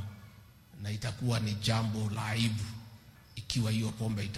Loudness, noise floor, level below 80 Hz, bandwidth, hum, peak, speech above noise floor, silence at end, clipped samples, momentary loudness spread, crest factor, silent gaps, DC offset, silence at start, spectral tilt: -33 LUFS; -55 dBFS; -56 dBFS; 13.5 kHz; none; -12 dBFS; 23 dB; 0 s; under 0.1%; 17 LU; 22 dB; none; under 0.1%; 0 s; -5 dB/octave